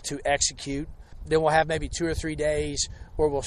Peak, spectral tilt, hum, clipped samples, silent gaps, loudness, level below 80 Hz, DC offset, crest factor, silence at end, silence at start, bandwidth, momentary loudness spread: -8 dBFS; -3.5 dB/octave; none; under 0.1%; none; -26 LUFS; -40 dBFS; under 0.1%; 18 dB; 0 s; 0 s; 12.5 kHz; 11 LU